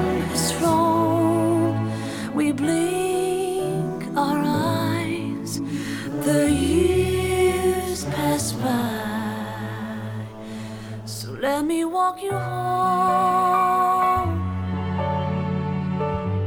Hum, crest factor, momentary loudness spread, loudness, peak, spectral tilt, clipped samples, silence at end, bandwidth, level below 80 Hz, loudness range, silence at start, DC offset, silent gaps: none; 14 dB; 11 LU; -23 LUFS; -8 dBFS; -5.5 dB/octave; under 0.1%; 0 s; 18.5 kHz; -44 dBFS; 6 LU; 0 s; under 0.1%; none